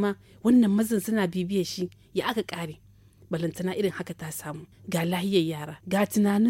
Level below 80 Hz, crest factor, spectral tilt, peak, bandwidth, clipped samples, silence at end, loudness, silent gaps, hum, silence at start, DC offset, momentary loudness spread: -62 dBFS; 16 dB; -5.5 dB/octave; -10 dBFS; 17 kHz; under 0.1%; 0 s; -27 LUFS; none; none; 0 s; under 0.1%; 14 LU